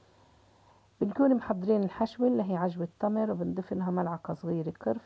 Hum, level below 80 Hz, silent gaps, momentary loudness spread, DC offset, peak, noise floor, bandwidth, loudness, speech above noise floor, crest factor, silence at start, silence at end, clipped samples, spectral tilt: none; -64 dBFS; none; 8 LU; under 0.1%; -16 dBFS; -62 dBFS; 7.4 kHz; -30 LUFS; 32 dB; 16 dB; 1 s; 0.05 s; under 0.1%; -10 dB/octave